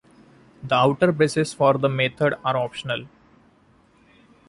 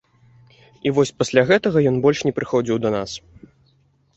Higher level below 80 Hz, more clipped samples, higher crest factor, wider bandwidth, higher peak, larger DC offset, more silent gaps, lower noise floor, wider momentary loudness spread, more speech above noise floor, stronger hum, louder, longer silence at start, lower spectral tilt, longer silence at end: second, -60 dBFS vs -54 dBFS; neither; about the same, 18 dB vs 18 dB; first, 11.5 kHz vs 8.2 kHz; about the same, -4 dBFS vs -2 dBFS; neither; neither; about the same, -57 dBFS vs -60 dBFS; about the same, 10 LU vs 10 LU; second, 36 dB vs 41 dB; neither; about the same, -21 LUFS vs -19 LUFS; second, 0.6 s vs 0.85 s; about the same, -5.5 dB/octave vs -5.5 dB/octave; first, 1.4 s vs 1 s